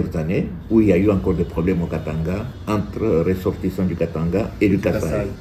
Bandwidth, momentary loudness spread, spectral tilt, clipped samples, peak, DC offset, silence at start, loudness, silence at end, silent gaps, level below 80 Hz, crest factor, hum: 15 kHz; 8 LU; -8.5 dB/octave; under 0.1%; -4 dBFS; under 0.1%; 0 s; -20 LUFS; 0 s; none; -36 dBFS; 16 dB; none